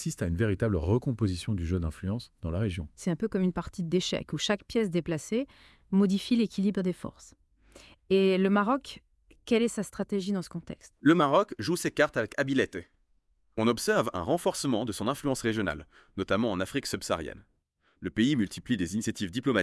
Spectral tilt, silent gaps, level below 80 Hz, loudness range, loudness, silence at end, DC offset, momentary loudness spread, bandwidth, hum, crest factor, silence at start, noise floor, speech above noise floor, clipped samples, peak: -5.5 dB/octave; none; -54 dBFS; 3 LU; -29 LUFS; 0 s; under 0.1%; 10 LU; 12 kHz; none; 20 dB; 0 s; -72 dBFS; 43 dB; under 0.1%; -10 dBFS